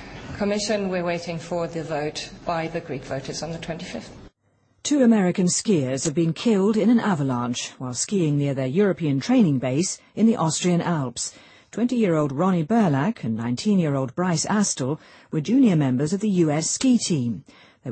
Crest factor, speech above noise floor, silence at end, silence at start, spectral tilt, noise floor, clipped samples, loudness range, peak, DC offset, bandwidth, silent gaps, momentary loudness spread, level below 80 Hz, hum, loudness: 14 dB; 42 dB; 0 s; 0 s; -5.5 dB/octave; -65 dBFS; under 0.1%; 6 LU; -8 dBFS; under 0.1%; 8.8 kHz; none; 11 LU; -56 dBFS; none; -23 LUFS